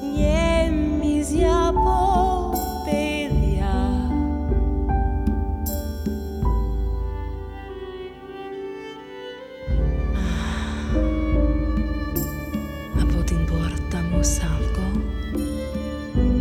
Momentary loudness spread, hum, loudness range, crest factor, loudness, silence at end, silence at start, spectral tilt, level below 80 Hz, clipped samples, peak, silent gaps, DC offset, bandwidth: 14 LU; none; 8 LU; 14 dB; -24 LUFS; 0 s; 0 s; -6 dB/octave; -26 dBFS; under 0.1%; -8 dBFS; none; under 0.1%; 16 kHz